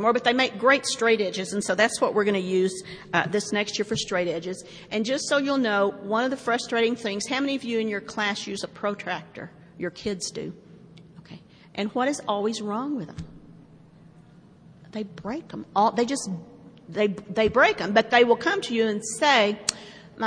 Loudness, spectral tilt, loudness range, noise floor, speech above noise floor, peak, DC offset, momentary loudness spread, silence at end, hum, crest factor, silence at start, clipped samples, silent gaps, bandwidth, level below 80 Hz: -25 LUFS; -3.5 dB/octave; 10 LU; -51 dBFS; 27 dB; -4 dBFS; under 0.1%; 15 LU; 0 s; none; 22 dB; 0 s; under 0.1%; none; 10.5 kHz; -60 dBFS